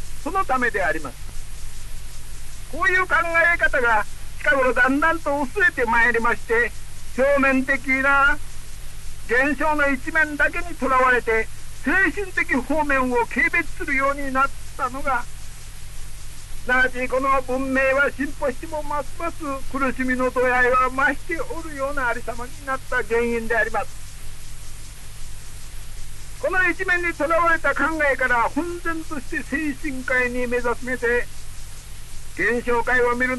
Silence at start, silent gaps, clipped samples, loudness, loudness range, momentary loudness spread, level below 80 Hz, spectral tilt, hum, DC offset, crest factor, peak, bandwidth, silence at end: 0 s; none; under 0.1%; -21 LUFS; 6 LU; 22 LU; -34 dBFS; -4.5 dB/octave; none; under 0.1%; 14 dB; -8 dBFS; 12 kHz; 0 s